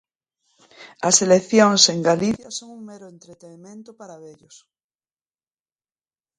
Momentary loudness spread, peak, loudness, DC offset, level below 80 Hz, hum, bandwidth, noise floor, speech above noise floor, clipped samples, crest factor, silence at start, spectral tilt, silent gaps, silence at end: 25 LU; 0 dBFS; -17 LUFS; under 0.1%; -64 dBFS; none; 11 kHz; under -90 dBFS; over 69 dB; under 0.1%; 22 dB; 0.8 s; -3 dB/octave; none; 2.1 s